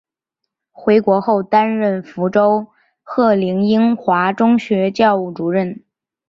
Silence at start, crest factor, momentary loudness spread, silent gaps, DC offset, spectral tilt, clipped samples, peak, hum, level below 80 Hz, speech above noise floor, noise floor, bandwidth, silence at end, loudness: 0.8 s; 14 dB; 7 LU; none; under 0.1%; -8 dB/octave; under 0.1%; -2 dBFS; none; -60 dBFS; 64 dB; -79 dBFS; 7.2 kHz; 0.5 s; -16 LUFS